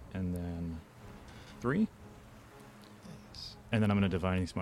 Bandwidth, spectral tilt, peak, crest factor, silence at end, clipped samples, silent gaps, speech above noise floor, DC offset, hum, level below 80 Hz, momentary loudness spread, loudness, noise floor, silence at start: 14 kHz; -7 dB/octave; -16 dBFS; 20 dB; 0 s; under 0.1%; none; 23 dB; under 0.1%; none; -54 dBFS; 23 LU; -34 LUFS; -54 dBFS; 0 s